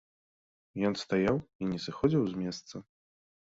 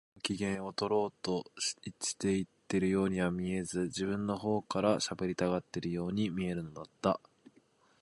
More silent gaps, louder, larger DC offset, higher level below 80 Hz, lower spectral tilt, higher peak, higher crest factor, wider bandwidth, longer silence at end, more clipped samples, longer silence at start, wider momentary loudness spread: first, 1.55-1.59 s vs none; first, -31 LUFS vs -34 LUFS; neither; about the same, -60 dBFS vs -62 dBFS; first, -6.5 dB/octave vs -5 dB/octave; about the same, -12 dBFS vs -14 dBFS; about the same, 20 dB vs 20 dB; second, 8 kHz vs 11.5 kHz; second, 0.6 s vs 0.85 s; neither; first, 0.75 s vs 0.25 s; first, 16 LU vs 6 LU